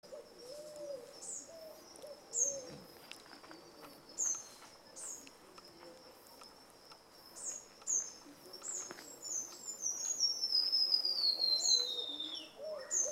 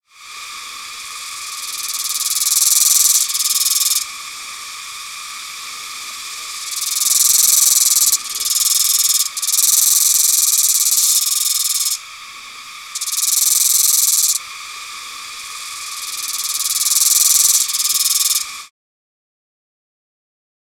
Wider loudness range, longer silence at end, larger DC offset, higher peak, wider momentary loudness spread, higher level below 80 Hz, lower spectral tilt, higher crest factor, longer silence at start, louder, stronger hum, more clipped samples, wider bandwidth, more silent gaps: first, 12 LU vs 6 LU; second, 0 s vs 2 s; neither; second, -18 dBFS vs -2 dBFS; first, 26 LU vs 18 LU; second, -82 dBFS vs -64 dBFS; first, 1.5 dB/octave vs 5 dB/octave; first, 22 dB vs 16 dB; second, 0.05 s vs 0.2 s; second, -35 LUFS vs -12 LUFS; neither; neither; second, 16 kHz vs over 20 kHz; neither